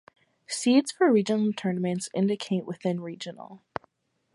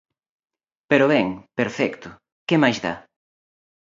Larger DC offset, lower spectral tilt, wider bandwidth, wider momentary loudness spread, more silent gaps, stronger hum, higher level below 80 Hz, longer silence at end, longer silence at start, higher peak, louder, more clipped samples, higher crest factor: neither; about the same, -5.5 dB/octave vs -6 dB/octave; first, 11.5 kHz vs 7.6 kHz; about the same, 17 LU vs 17 LU; second, none vs 2.32-2.46 s; neither; second, -72 dBFS vs -62 dBFS; second, 0.8 s vs 1 s; second, 0.5 s vs 0.9 s; second, -10 dBFS vs -2 dBFS; second, -26 LUFS vs -21 LUFS; neither; about the same, 18 dB vs 22 dB